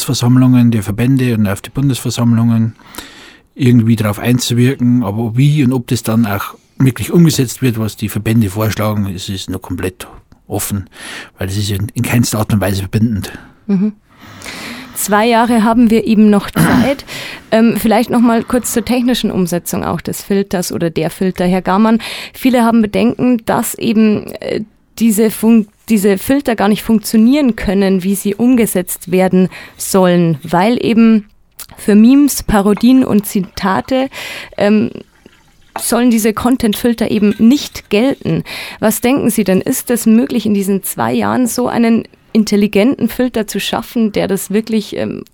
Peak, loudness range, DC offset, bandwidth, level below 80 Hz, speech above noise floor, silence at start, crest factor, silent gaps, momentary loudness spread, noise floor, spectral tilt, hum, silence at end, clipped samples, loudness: 0 dBFS; 5 LU; under 0.1%; 19 kHz; -40 dBFS; 33 dB; 0 s; 12 dB; none; 11 LU; -45 dBFS; -6 dB/octave; none; 0.15 s; under 0.1%; -13 LUFS